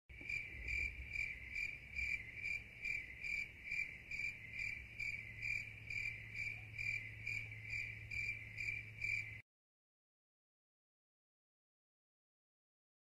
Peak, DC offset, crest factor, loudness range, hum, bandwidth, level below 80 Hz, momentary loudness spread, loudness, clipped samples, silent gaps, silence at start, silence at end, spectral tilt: -30 dBFS; under 0.1%; 18 dB; 4 LU; none; 15 kHz; -62 dBFS; 3 LU; -43 LUFS; under 0.1%; none; 0.1 s; 3.65 s; -3 dB/octave